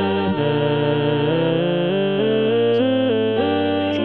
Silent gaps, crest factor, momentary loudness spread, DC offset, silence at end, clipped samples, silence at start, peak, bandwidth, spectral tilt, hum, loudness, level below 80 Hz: none; 12 dB; 2 LU; 0.4%; 0 s; under 0.1%; 0 s; -6 dBFS; 5.6 kHz; -9 dB/octave; none; -19 LUFS; -62 dBFS